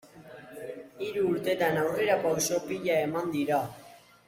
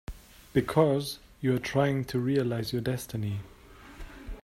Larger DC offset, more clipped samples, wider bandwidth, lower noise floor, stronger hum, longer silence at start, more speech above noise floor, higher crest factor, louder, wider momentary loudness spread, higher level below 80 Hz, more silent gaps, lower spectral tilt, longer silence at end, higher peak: neither; neither; about the same, 16.5 kHz vs 16 kHz; about the same, -49 dBFS vs -48 dBFS; neither; about the same, 0.05 s vs 0.1 s; about the same, 21 dB vs 20 dB; about the same, 18 dB vs 22 dB; about the same, -28 LUFS vs -29 LUFS; second, 17 LU vs 21 LU; second, -68 dBFS vs -50 dBFS; neither; second, -4 dB/octave vs -6.5 dB/octave; first, 0.3 s vs 0.05 s; second, -12 dBFS vs -8 dBFS